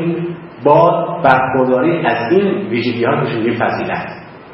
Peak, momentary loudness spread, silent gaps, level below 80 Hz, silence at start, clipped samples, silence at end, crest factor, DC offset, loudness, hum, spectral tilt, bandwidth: 0 dBFS; 11 LU; none; -52 dBFS; 0 s; under 0.1%; 0 s; 14 dB; under 0.1%; -14 LUFS; none; -9.5 dB/octave; 5.8 kHz